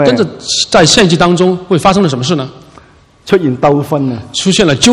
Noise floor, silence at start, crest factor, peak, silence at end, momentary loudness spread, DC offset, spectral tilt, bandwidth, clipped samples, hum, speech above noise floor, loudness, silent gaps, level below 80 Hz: -41 dBFS; 0 s; 10 dB; 0 dBFS; 0 s; 9 LU; under 0.1%; -4.5 dB/octave; 15 kHz; 0.6%; none; 31 dB; -10 LUFS; none; -38 dBFS